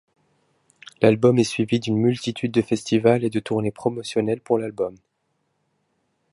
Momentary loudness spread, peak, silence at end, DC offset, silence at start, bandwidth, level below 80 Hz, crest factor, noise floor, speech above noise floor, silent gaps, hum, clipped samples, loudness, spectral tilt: 8 LU; -2 dBFS; 1.4 s; under 0.1%; 1 s; 11.5 kHz; -60 dBFS; 20 dB; -72 dBFS; 51 dB; none; none; under 0.1%; -22 LUFS; -6.5 dB/octave